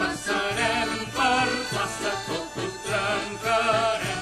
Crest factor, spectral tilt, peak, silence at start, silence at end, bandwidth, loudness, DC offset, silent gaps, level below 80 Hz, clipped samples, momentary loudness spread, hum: 16 dB; -3 dB/octave; -10 dBFS; 0 s; 0 s; 13 kHz; -25 LUFS; under 0.1%; none; -50 dBFS; under 0.1%; 8 LU; none